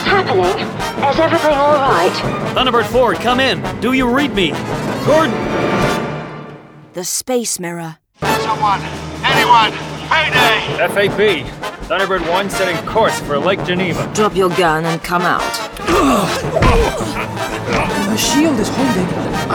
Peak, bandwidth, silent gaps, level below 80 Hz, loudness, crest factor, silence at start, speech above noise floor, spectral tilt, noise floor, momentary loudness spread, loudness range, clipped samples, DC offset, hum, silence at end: 0 dBFS; over 20 kHz; none; -32 dBFS; -15 LUFS; 16 dB; 0 s; 21 dB; -4 dB/octave; -35 dBFS; 9 LU; 4 LU; under 0.1%; under 0.1%; none; 0 s